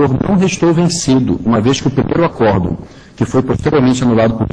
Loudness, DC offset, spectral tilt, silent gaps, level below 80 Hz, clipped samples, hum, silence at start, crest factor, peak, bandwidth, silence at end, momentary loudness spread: -13 LUFS; under 0.1%; -6 dB/octave; none; -34 dBFS; under 0.1%; none; 0 s; 12 dB; 0 dBFS; 10.5 kHz; 0.05 s; 4 LU